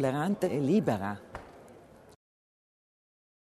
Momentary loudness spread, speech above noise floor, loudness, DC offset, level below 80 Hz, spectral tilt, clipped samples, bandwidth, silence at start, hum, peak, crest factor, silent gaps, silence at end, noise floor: 20 LU; 25 dB; -29 LUFS; under 0.1%; -64 dBFS; -7.5 dB/octave; under 0.1%; 13.5 kHz; 0 s; none; -14 dBFS; 20 dB; none; 1.8 s; -54 dBFS